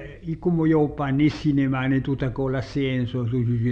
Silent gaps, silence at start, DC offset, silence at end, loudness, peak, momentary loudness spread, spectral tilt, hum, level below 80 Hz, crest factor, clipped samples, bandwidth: none; 0 s; under 0.1%; 0 s; -23 LUFS; -8 dBFS; 6 LU; -8.5 dB/octave; none; -44 dBFS; 14 dB; under 0.1%; 7.4 kHz